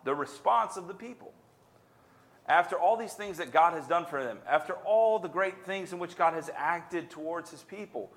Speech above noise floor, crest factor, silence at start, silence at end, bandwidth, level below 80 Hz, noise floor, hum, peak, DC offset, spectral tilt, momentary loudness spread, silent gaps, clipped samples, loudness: 32 dB; 20 dB; 0.05 s; 0.1 s; 15.5 kHz; -78 dBFS; -62 dBFS; none; -10 dBFS; under 0.1%; -4.5 dB/octave; 16 LU; none; under 0.1%; -30 LUFS